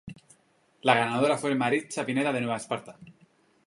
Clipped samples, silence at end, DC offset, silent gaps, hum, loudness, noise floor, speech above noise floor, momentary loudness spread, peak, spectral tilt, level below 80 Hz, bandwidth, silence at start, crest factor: under 0.1%; 0.55 s; under 0.1%; none; none; -27 LUFS; -66 dBFS; 39 dB; 11 LU; -4 dBFS; -5 dB/octave; -70 dBFS; 11.5 kHz; 0.05 s; 24 dB